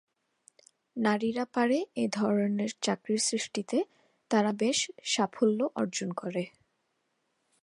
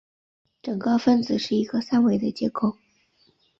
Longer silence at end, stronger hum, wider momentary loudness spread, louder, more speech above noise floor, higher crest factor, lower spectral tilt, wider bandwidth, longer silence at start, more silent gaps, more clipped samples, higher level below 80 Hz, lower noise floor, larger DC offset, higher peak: first, 1.15 s vs 0.85 s; neither; about the same, 7 LU vs 8 LU; second, -30 LUFS vs -23 LUFS; first, 48 dB vs 41 dB; about the same, 18 dB vs 16 dB; second, -4 dB/octave vs -6.5 dB/octave; first, 11.5 kHz vs 7.4 kHz; first, 0.95 s vs 0.65 s; neither; neither; second, -78 dBFS vs -62 dBFS; first, -78 dBFS vs -64 dBFS; neither; second, -12 dBFS vs -8 dBFS